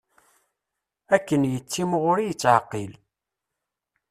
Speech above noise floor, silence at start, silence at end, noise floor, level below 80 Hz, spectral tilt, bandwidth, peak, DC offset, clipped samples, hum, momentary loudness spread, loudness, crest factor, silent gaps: 62 dB; 1.1 s; 1.2 s; -85 dBFS; -64 dBFS; -5.5 dB/octave; 14.5 kHz; -4 dBFS; under 0.1%; under 0.1%; none; 13 LU; -23 LUFS; 22 dB; none